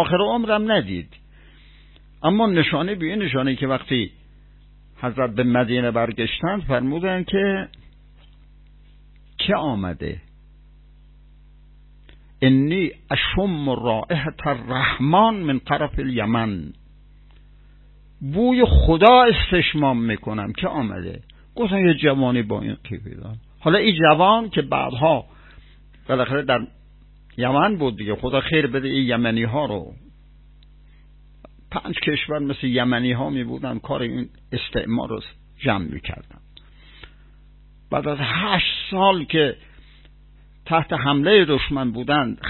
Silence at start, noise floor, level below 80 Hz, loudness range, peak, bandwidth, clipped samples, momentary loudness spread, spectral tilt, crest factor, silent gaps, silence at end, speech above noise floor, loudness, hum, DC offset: 0 s; -48 dBFS; -36 dBFS; 9 LU; 0 dBFS; 4.3 kHz; under 0.1%; 15 LU; -10 dB/octave; 22 dB; none; 0 s; 28 dB; -20 LUFS; 50 Hz at -50 dBFS; under 0.1%